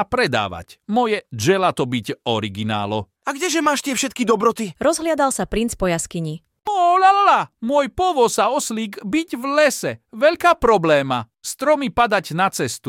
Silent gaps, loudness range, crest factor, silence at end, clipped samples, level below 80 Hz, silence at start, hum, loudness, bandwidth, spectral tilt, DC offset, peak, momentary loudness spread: none; 3 LU; 16 dB; 0 s; under 0.1%; -46 dBFS; 0 s; none; -19 LUFS; 17 kHz; -4 dB/octave; under 0.1%; -4 dBFS; 10 LU